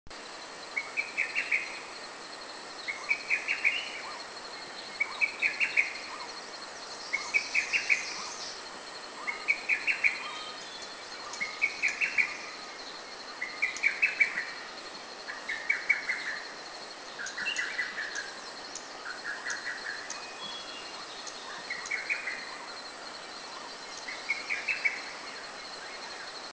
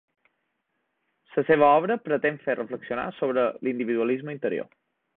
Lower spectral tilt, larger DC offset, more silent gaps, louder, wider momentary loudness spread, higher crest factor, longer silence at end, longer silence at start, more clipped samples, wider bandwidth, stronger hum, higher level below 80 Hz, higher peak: second, 0 dB/octave vs -10.5 dB/octave; neither; neither; second, -32 LUFS vs -25 LUFS; about the same, 14 LU vs 12 LU; about the same, 24 dB vs 20 dB; second, 0 s vs 0.5 s; second, 0.05 s vs 1.3 s; neither; first, 8 kHz vs 4.1 kHz; neither; about the same, -72 dBFS vs -68 dBFS; second, -10 dBFS vs -6 dBFS